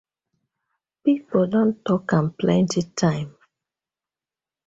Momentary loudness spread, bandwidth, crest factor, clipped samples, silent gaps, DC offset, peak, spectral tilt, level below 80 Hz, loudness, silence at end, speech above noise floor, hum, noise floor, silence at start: 5 LU; 8 kHz; 18 dB; under 0.1%; none; under 0.1%; -4 dBFS; -6.5 dB/octave; -58 dBFS; -22 LUFS; 1.4 s; over 69 dB; none; under -90 dBFS; 1.05 s